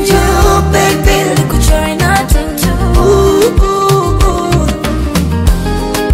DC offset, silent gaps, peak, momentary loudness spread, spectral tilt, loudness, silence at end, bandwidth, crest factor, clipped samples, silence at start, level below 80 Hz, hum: under 0.1%; none; 0 dBFS; 5 LU; -5 dB/octave; -11 LUFS; 0 s; 16.5 kHz; 10 dB; under 0.1%; 0 s; -14 dBFS; none